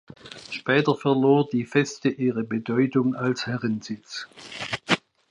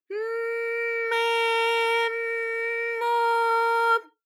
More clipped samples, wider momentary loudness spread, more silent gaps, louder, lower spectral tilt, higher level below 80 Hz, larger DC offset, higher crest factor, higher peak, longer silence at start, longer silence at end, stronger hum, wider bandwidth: neither; first, 15 LU vs 6 LU; neither; about the same, -24 LUFS vs -24 LUFS; first, -6 dB/octave vs 2.5 dB/octave; first, -66 dBFS vs under -90 dBFS; neither; first, 22 dB vs 14 dB; first, -4 dBFS vs -12 dBFS; first, 0.25 s vs 0.1 s; about the same, 0.35 s vs 0.25 s; neither; second, 11 kHz vs 15 kHz